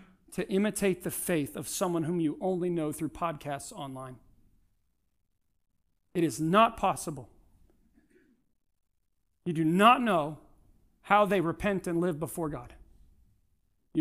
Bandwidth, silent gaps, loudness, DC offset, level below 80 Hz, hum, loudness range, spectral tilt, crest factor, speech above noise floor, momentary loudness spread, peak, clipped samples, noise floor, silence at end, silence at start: 15.5 kHz; none; -29 LUFS; under 0.1%; -58 dBFS; none; 9 LU; -5 dB/octave; 22 dB; 49 dB; 17 LU; -8 dBFS; under 0.1%; -78 dBFS; 0 s; 0 s